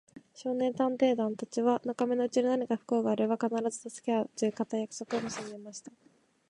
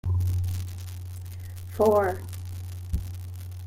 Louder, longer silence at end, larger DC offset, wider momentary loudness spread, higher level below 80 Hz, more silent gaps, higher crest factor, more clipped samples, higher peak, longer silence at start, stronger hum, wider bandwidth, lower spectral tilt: about the same, -31 LUFS vs -29 LUFS; first, 0.6 s vs 0 s; neither; second, 11 LU vs 17 LU; second, -78 dBFS vs -42 dBFS; neither; about the same, 18 dB vs 18 dB; neither; second, -14 dBFS vs -10 dBFS; about the same, 0.15 s vs 0.05 s; neither; second, 11 kHz vs 16.5 kHz; second, -5 dB/octave vs -7 dB/octave